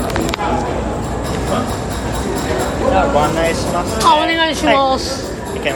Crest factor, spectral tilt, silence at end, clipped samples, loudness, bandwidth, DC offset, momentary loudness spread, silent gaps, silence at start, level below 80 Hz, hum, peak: 16 dB; -4.5 dB/octave; 0 s; under 0.1%; -16 LUFS; 17 kHz; under 0.1%; 8 LU; none; 0 s; -28 dBFS; none; 0 dBFS